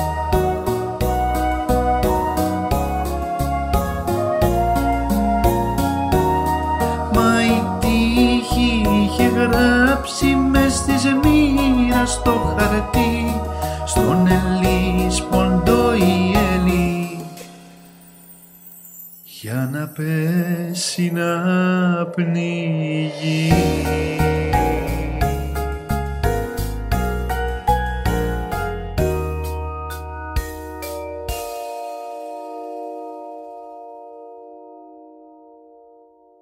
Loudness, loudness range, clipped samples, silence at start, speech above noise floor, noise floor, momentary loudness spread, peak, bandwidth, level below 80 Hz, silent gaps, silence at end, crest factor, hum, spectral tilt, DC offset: -19 LUFS; 13 LU; under 0.1%; 0 s; 31 dB; -50 dBFS; 15 LU; -2 dBFS; 16 kHz; -28 dBFS; none; 1.3 s; 18 dB; none; -5.5 dB/octave; under 0.1%